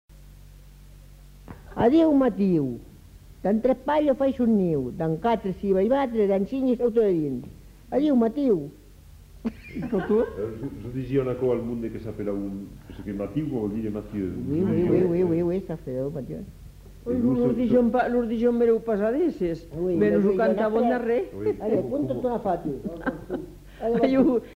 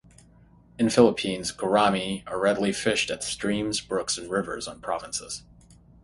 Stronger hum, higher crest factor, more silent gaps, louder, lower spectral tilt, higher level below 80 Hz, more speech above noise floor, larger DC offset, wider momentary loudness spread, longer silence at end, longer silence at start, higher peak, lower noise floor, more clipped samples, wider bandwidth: neither; second, 16 dB vs 22 dB; neither; about the same, -25 LUFS vs -25 LUFS; first, -9 dB/octave vs -4 dB/octave; first, -48 dBFS vs -56 dBFS; second, 24 dB vs 30 dB; neither; about the same, 14 LU vs 12 LU; second, 0.05 s vs 0.3 s; second, 0.15 s vs 0.8 s; second, -8 dBFS vs -4 dBFS; second, -48 dBFS vs -55 dBFS; neither; first, 16 kHz vs 11.5 kHz